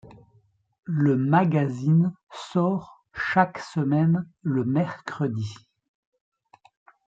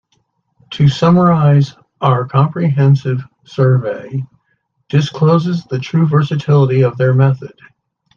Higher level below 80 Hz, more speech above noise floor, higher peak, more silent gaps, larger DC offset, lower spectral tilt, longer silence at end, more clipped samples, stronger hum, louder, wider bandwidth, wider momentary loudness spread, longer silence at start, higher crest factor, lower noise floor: second, -64 dBFS vs -52 dBFS; second, 40 dB vs 52 dB; second, -4 dBFS vs 0 dBFS; first, 0.79-0.83 s, 2.23-2.27 s vs none; neither; about the same, -8.5 dB/octave vs -8.5 dB/octave; first, 1.55 s vs 0.7 s; neither; neither; second, -24 LUFS vs -13 LUFS; first, 7.8 kHz vs 7 kHz; about the same, 11 LU vs 13 LU; second, 0.05 s vs 0.7 s; first, 22 dB vs 14 dB; about the same, -63 dBFS vs -64 dBFS